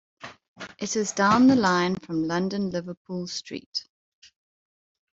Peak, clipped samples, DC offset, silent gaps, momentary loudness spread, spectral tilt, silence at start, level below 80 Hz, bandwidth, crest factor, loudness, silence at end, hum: -8 dBFS; under 0.1%; under 0.1%; 0.48-0.56 s, 2.97-3.05 s, 3.66-3.72 s; 24 LU; -4.5 dB/octave; 0.25 s; -64 dBFS; 8 kHz; 18 dB; -25 LUFS; 1.3 s; none